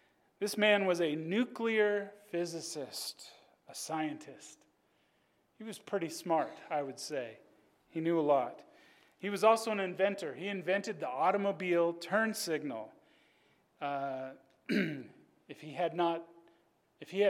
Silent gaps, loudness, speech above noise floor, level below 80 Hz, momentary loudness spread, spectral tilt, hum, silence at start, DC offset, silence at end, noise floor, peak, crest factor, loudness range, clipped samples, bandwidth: none; -34 LUFS; 40 dB; -88 dBFS; 18 LU; -4.5 dB/octave; none; 0.4 s; under 0.1%; 0 s; -74 dBFS; -14 dBFS; 22 dB; 8 LU; under 0.1%; 16 kHz